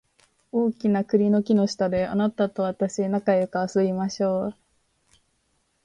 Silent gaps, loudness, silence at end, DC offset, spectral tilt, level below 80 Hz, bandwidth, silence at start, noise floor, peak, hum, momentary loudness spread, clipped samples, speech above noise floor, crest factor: none; -24 LUFS; 1.3 s; under 0.1%; -7 dB/octave; -60 dBFS; 9.4 kHz; 0.55 s; -70 dBFS; -8 dBFS; none; 5 LU; under 0.1%; 47 dB; 16 dB